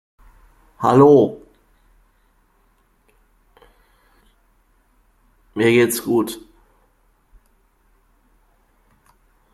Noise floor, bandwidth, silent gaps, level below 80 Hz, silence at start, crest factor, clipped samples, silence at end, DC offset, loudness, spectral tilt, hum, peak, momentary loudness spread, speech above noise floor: -60 dBFS; 15 kHz; none; -56 dBFS; 0.8 s; 20 dB; under 0.1%; 3.15 s; under 0.1%; -16 LUFS; -6 dB/octave; none; -2 dBFS; 23 LU; 46 dB